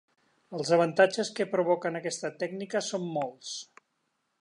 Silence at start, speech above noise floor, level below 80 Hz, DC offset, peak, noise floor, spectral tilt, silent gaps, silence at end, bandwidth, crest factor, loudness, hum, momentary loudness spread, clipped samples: 0.5 s; 49 dB; -84 dBFS; under 0.1%; -8 dBFS; -78 dBFS; -4 dB/octave; none; 0.75 s; 11 kHz; 22 dB; -29 LUFS; none; 14 LU; under 0.1%